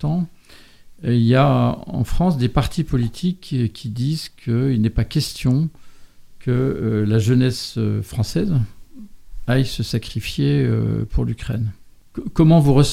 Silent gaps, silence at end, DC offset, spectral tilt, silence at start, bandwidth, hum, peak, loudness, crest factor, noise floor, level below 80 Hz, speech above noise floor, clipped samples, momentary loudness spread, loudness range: none; 0 s; under 0.1%; -7 dB/octave; 0 s; 15 kHz; none; 0 dBFS; -20 LUFS; 18 dB; -45 dBFS; -34 dBFS; 27 dB; under 0.1%; 11 LU; 3 LU